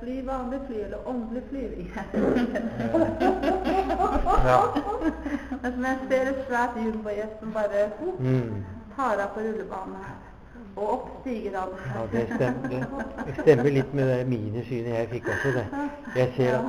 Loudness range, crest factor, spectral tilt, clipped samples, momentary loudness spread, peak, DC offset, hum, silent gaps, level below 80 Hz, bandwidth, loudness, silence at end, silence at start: 6 LU; 22 dB; -7.5 dB/octave; under 0.1%; 10 LU; -4 dBFS; 0.1%; none; none; -40 dBFS; 15 kHz; -27 LUFS; 0 s; 0 s